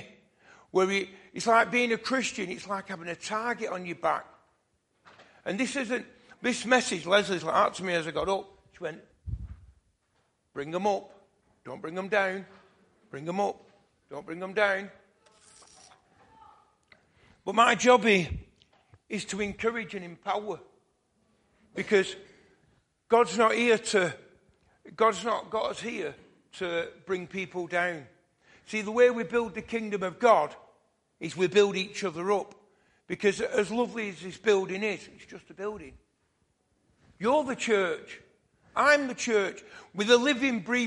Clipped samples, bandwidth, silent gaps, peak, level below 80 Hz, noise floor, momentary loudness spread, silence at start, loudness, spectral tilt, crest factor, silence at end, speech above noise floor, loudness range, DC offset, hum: under 0.1%; 11.5 kHz; none; -6 dBFS; -58 dBFS; -73 dBFS; 18 LU; 0 s; -28 LUFS; -4 dB/octave; 22 dB; 0 s; 45 dB; 8 LU; under 0.1%; none